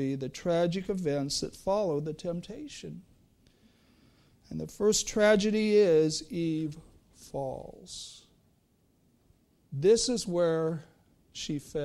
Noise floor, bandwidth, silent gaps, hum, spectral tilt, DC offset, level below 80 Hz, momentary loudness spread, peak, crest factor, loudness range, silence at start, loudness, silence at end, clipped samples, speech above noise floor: -68 dBFS; 14 kHz; none; none; -4.5 dB/octave; under 0.1%; -58 dBFS; 18 LU; -12 dBFS; 18 dB; 10 LU; 0 s; -29 LUFS; 0 s; under 0.1%; 39 dB